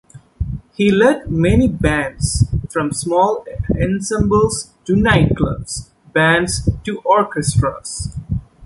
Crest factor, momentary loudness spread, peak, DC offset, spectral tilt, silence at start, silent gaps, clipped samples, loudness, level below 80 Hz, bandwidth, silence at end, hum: 16 dB; 12 LU; -2 dBFS; under 0.1%; -5.5 dB/octave; 0.15 s; none; under 0.1%; -17 LUFS; -30 dBFS; 11.5 kHz; 0 s; none